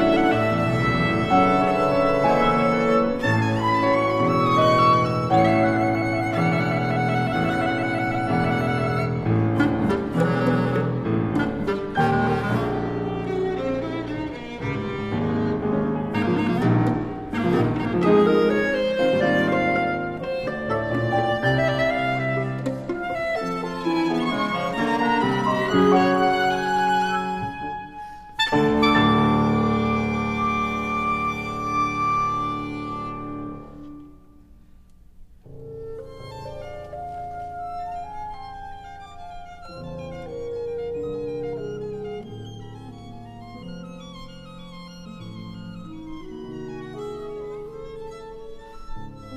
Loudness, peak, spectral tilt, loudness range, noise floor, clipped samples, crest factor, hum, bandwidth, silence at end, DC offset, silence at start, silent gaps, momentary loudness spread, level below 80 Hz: -22 LUFS; -6 dBFS; -7 dB/octave; 17 LU; -48 dBFS; under 0.1%; 18 dB; none; 14 kHz; 0 s; under 0.1%; 0 s; none; 20 LU; -44 dBFS